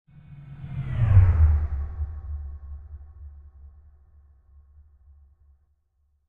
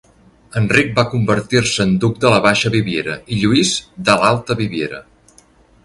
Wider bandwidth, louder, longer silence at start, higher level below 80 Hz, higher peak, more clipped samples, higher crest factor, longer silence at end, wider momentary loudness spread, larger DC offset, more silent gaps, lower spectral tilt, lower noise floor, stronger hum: second, 3.2 kHz vs 11.5 kHz; second, -24 LUFS vs -16 LUFS; second, 0.3 s vs 0.55 s; first, -30 dBFS vs -44 dBFS; second, -6 dBFS vs 0 dBFS; neither; first, 22 dB vs 16 dB; first, 2.6 s vs 0.85 s; first, 27 LU vs 9 LU; neither; neither; first, -10.5 dB/octave vs -4.5 dB/octave; first, -69 dBFS vs -50 dBFS; neither